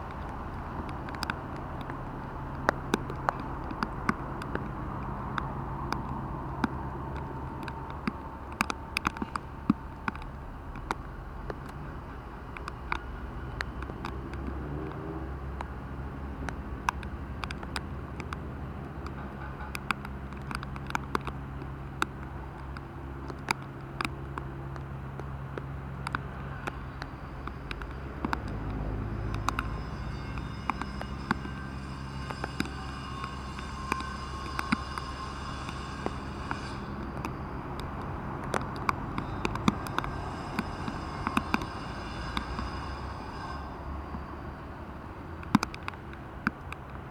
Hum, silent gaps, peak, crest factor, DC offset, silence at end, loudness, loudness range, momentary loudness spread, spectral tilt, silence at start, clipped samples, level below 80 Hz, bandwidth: none; none; -4 dBFS; 32 dB; under 0.1%; 0 s; -36 LUFS; 5 LU; 9 LU; -5.5 dB/octave; 0 s; under 0.1%; -42 dBFS; 18 kHz